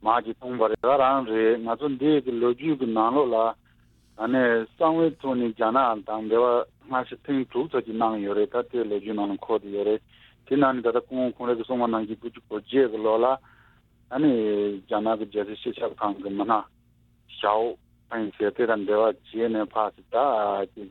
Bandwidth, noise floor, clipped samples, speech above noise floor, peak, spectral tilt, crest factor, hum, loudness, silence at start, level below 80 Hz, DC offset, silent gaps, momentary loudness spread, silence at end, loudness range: 4.3 kHz; -61 dBFS; under 0.1%; 37 dB; -6 dBFS; -8.5 dB/octave; 18 dB; none; -25 LUFS; 0 s; -62 dBFS; under 0.1%; none; 9 LU; 0 s; 4 LU